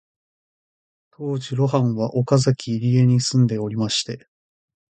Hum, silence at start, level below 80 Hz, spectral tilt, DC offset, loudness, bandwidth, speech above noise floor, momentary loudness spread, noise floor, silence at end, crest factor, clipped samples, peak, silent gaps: none; 1.2 s; -58 dBFS; -6 dB/octave; under 0.1%; -20 LUFS; 9.2 kHz; over 71 dB; 11 LU; under -90 dBFS; 0.75 s; 18 dB; under 0.1%; -4 dBFS; none